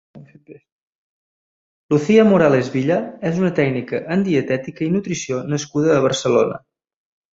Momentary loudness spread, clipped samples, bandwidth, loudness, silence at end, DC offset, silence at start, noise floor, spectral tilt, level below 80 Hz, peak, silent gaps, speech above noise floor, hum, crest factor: 10 LU; under 0.1%; 8 kHz; -18 LUFS; 0.8 s; under 0.1%; 0.15 s; -44 dBFS; -6 dB/octave; -58 dBFS; -2 dBFS; 0.72-1.89 s; 27 dB; none; 18 dB